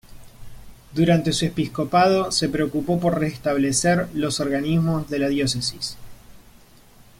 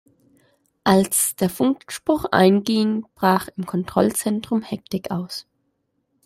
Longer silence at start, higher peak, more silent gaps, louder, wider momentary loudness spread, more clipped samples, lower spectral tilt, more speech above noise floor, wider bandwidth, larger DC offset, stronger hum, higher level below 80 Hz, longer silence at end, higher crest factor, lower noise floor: second, 0.1 s vs 0.85 s; second, -6 dBFS vs 0 dBFS; neither; about the same, -21 LUFS vs -21 LUFS; second, 6 LU vs 11 LU; neither; about the same, -5 dB/octave vs -4.5 dB/octave; second, 28 dB vs 51 dB; about the same, 16.5 kHz vs 16 kHz; neither; neither; first, -46 dBFS vs -56 dBFS; about the same, 0.8 s vs 0.85 s; about the same, 18 dB vs 20 dB; second, -49 dBFS vs -71 dBFS